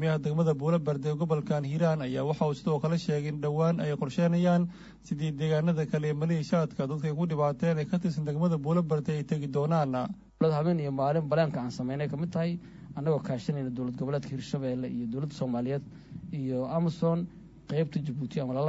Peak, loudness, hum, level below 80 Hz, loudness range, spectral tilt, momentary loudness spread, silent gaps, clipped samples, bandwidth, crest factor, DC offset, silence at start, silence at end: -12 dBFS; -30 LUFS; none; -60 dBFS; 4 LU; -8 dB/octave; 7 LU; none; under 0.1%; 8 kHz; 16 dB; under 0.1%; 0 s; 0 s